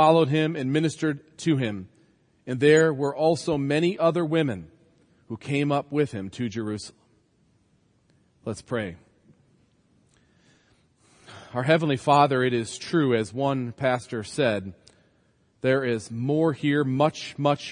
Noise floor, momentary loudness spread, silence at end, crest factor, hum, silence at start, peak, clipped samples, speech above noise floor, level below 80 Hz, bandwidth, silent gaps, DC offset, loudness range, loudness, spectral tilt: -65 dBFS; 15 LU; 0 s; 20 dB; none; 0 s; -6 dBFS; under 0.1%; 41 dB; -66 dBFS; 10.5 kHz; none; under 0.1%; 15 LU; -25 LUFS; -6 dB/octave